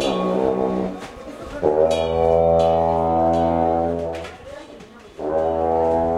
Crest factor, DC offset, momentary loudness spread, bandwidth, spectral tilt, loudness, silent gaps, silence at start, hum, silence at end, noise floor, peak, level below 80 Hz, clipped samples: 16 dB; under 0.1%; 18 LU; 12 kHz; -7 dB/octave; -20 LUFS; none; 0 s; none; 0 s; -41 dBFS; -4 dBFS; -40 dBFS; under 0.1%